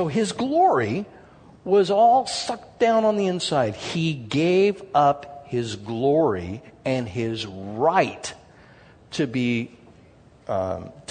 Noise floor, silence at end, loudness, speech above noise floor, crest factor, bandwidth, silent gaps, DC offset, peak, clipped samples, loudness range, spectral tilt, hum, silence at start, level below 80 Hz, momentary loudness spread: -52 dBFS; 0.1 s; -23 LUFS; 30 dB; 18 dB; 9.6 kHz; none; under 0.1%; -4 dBFS; under 0.1%; 5 LU; -5.5 dB/octave; none; 0 s; -60 dBFS; 13 LU